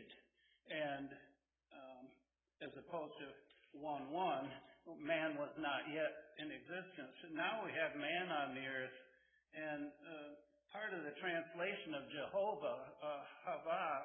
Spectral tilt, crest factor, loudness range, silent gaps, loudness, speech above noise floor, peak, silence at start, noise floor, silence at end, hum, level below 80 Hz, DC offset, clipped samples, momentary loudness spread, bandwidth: 0 dB/octave; 20 dB; 7 LU; none; -45 LUFS; 32 dB; -26 dBFS; 0 s; -77 dBFS; 0 s; none; -86 dBFS; under 0.1%; under 0.1%; 17 LU; 3.6 kHz